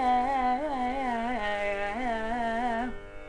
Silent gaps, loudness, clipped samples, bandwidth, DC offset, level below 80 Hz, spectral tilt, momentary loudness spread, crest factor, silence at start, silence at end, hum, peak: none; -30 LUFS; under 0.1%; 10.5 kHz; under 0.1%; -46 dBFS; -5 dB/octave; 5 LU; 12 dB; 0 s; 0 s; none; -16 dBFS